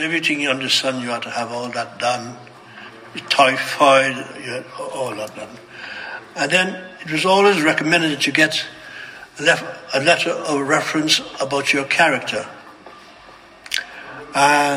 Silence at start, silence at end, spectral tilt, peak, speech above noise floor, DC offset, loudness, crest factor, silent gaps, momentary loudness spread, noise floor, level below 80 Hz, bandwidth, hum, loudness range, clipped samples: 0 s; 0 s; -3 dB/octave; 0 dBFS; 25 dB; under 0.1%; -18 LUFS; 20 dB; none; 20 LU; -44 dBFS; -64 dBFS; 16 kHz; none; 4 LU; under 0.1%